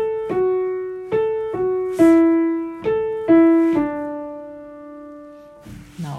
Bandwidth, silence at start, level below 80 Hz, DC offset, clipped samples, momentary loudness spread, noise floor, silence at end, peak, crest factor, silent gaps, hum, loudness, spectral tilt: 9.4 kHz; 0 s; -54 dBFS; under 0.1%; under 0.1%; 24 LU; -41 dBFS; 0 s; -4 dBFS; 16 dB; none; none; -18 LUFS; -8 dB/octave